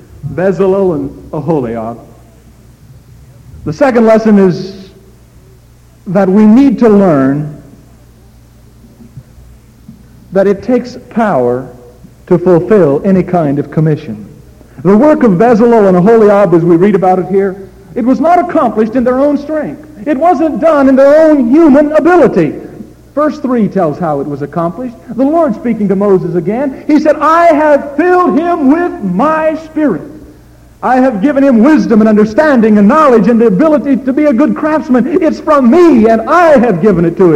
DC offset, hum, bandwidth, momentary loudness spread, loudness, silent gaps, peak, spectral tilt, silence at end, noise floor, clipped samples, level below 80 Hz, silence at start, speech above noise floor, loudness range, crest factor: under 0.1%; none; 10 kHz; 12 LU; -8 LUFS; none; 0 dBFS; -8.5 dB/octave; 0 s; -40 dBFS; under 0.1%; -40 dBFS; 0.25 s; 32 dB; 8 LU; 8 dB